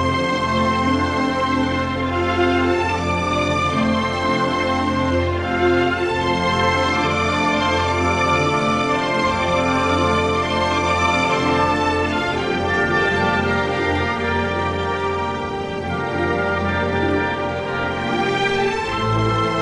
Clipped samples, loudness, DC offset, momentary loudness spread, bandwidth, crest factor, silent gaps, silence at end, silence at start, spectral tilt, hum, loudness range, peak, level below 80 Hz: under 0.1%; -19 LUFS; under 0.1%; 4 LU; 11.5 kHz; 14 dB; none; 0 s; 0 s; -5.5 dB/octave; none; 3 LU; -6 dBFS; -38 dBFS